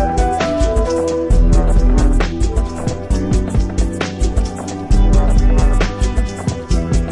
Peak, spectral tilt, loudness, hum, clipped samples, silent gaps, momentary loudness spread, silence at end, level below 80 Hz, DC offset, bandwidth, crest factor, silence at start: -2 dBFS; -6.5 dB/octave; -17 LUFS; none; under 0.1%; none; 6 LU; 0 s; -14 dBFS; under 0.1%; 11 kHz; 12 dB; 0 s